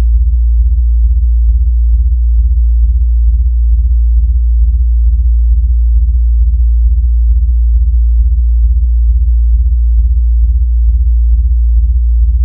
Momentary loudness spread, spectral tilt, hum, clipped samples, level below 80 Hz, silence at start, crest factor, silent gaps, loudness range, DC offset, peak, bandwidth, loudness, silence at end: 0 LU; -14 dB/octave; none; under 0.1%; -8 dBFS; 0 s; 6 dB; none; 0 LU; under 0.1%; -2 dBFS; 0.2 kHz; -12 LUFS; 0 s